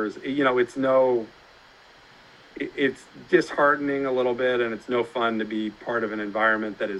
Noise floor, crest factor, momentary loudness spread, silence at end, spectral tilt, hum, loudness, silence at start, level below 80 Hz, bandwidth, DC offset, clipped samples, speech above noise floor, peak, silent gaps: -52 dBFS; 20 dB; 8 LU; 0 s; -5.5 dB/octave; none; -24 LUFS; 0 s; -62 dBFS; 11 kHz; under 0.1%; under 0.1%; 28 dB; -6 dBFS; none